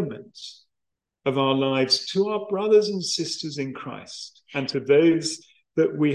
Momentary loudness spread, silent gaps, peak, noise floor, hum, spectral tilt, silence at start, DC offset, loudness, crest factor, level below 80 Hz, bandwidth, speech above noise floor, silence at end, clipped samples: 18 LU; none; -6 dBFS; -83 dBFS; none; -4.5 dB/octave; 0 s; under 0.1%; -23 LUFS; 16 dB; -70 dBFS; 11.5 kHz; 61 dB; 0 s; under 0.1%